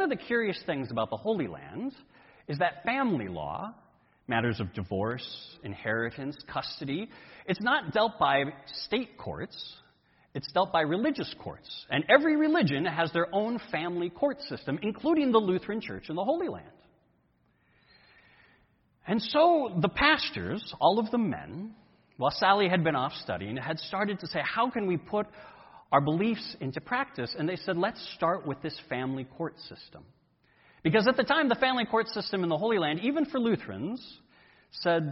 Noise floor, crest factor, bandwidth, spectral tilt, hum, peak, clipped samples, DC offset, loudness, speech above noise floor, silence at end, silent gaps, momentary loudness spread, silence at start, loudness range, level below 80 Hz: -69 dBFS; 24 dB; 6 kHz; -8.5 dB/octave; none; -6 dBFS; under 0.1%; under 0.1%; -29 LUFS; 40 dB; 0 s; none; 15 LU; 0 s; 6 LU; -62 dBFS